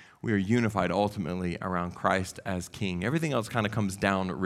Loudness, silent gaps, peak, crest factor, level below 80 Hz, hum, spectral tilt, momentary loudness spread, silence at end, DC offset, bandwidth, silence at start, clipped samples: -29 LUFS; none; -8 dBFS; 22 dB; -56 dBFS; none; -6 dB/octave; 6 LU; 0 s; under 0.1%; 15 kHz; 0 s; under 0.1%